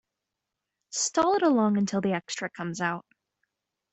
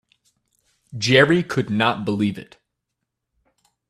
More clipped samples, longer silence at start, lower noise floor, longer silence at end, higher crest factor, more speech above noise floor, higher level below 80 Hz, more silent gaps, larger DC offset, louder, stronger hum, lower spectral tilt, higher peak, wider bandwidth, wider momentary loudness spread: neither; about the same, 0.9 s vs 0.9 s; first, -86 dBFS vs -80 dBFS; second, 0.95 s vs 1.45 s; about the same, 18 dB vs 22 dB; about the same, 60 dB vs 61 dB; second, -70 dBFS vs -60 dBFS; neither; neither; second, -27 LUFS vs -19 LUFS; neither; about the same, -4.5 dB/octave vs -5.5 dB/octave; second, -10 dBFS vs 0 dBFS; second, 8.4 kHz vs 13 kHz; second, 11 LU vs 14 LU